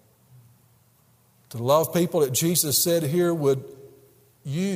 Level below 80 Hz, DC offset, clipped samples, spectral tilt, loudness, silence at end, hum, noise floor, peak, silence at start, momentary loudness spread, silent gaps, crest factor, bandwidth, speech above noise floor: -66 dBFS; under 0.1%; under 0.1%; -4.5 dB/octave; -22 LUFS; 0 s; none; -60 dBFS; -8 dBFS; 1.55 s; 15 LU; none; 18 dB; 16 kHz; 38 dB